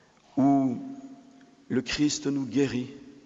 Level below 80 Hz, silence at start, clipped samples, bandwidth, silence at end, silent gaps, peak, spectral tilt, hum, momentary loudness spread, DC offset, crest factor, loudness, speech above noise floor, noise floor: -58 dBFS; 0.35 s; under 0.1%; 8 kHz; 0.15 s; none; -12 dBFS; -5 dB/octave; none; 18 LU; under 0.1%; 16 dB; -27 LUFS; 27 dB; -54 dBFS